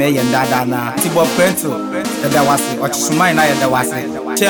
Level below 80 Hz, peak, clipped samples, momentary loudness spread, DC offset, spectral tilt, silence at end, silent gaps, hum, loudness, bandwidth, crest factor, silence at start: -50 dBFS; 0 dBFS; under 0.1%; 7 LU; under 0.1%; -4 dB/octave; 0 s; none; none; -15 LUFS; over 20 kHz; 14 dB; 0 s